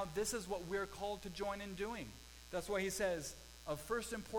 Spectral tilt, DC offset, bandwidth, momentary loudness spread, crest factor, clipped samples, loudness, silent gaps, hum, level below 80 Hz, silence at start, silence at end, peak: -3.5 dB/octave; under 0.1%; 19 kHz; 10 LU; 16 dB; under 0.1%; -42 LUFS; none; none; -60 dBFS; 0 s; 0 s; -26 dBFS